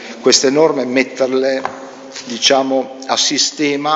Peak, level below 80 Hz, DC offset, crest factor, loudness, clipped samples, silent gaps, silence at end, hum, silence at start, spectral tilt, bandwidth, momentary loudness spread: 0 dBFS; -66 dBFS; under 0.1%; 16 dB; -14 LUFS; under 0.1%; none; 0 s; none; 0 s; -2 dB/octave; 11 kHz; 15 LU